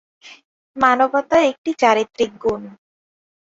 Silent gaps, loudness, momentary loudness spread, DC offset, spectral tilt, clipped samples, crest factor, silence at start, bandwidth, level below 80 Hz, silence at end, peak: 0.45-0.74 s, 1.58-1.64 s; -18 LUFS; 8 LU; under 0.1%; -4 dB/octave; under 0.1%; 18 dB; 0.25 s; 8 kHz; -54 dBFS; 0.7 s; -2 dBFS